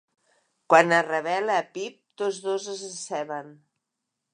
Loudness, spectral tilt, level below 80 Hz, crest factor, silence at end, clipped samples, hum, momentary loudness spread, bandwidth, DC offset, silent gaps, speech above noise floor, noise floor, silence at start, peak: -25 LUFS; -3.5 dB/octave; -86 dBFS; 24 dB; 0.8 s; under 0.1%; none; 17 LU; 11 kHz; under 0.1%; none; 58 dB; -83 dBFS; 0.7 s; -2 dBFS